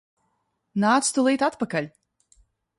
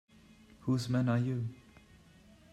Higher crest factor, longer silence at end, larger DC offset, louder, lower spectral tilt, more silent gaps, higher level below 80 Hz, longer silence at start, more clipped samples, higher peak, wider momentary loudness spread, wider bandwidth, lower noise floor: about the same, 18 dB vs 16 dB; about the same, 0.9 s vs 0.95 s; neither; first, -23 LUFS vs -34 LUFS; second, -4 dB/octave vs -7.5 dB/octave; neither; about the same, -68 dBFS vs -66 dBFS; about the same, 0.75 s vs 0.65 s; neither; first, -8 dBFS vs -18 dBFS; about the same, 11 LU vs 11 LU; about the same, 11.5 kHz vs 12 kHz; first, -74 dBFS vs -60 dBFS